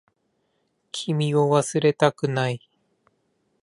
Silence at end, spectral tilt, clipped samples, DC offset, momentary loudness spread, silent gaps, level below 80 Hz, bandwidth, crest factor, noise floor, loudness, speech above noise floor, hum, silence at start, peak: 1.05 s; -5.5 dB/octave; under 0.1%; under 0.1%; 12 LU; none; -70 dBFS; 11.5 kHz; 22 dB; -71 dBFS; -22 LUFS; 50 dB; none; 0.95 s; -2 dBFS